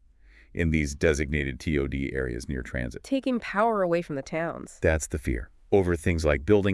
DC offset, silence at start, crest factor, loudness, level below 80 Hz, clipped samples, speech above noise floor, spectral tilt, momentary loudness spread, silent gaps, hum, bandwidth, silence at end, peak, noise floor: under 0.1%; 0.55 s; 18 dB; -27 LUFS; -38 dBFS; under 0.1%; 29 dB; -6 dB/octave; 9 LU; none; none; 12 kHz; 0 s; -8 dBFS; -55 dBFS